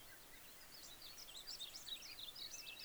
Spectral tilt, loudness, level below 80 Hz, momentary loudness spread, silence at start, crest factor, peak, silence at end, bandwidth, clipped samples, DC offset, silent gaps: 0 dB/octave; -51 LUFS; -72 dBFS; 8 LU; 0 s; 16 dB; -38 dBFS; 0 s; over 20 kHz; under 0.1%; under 0.1%; none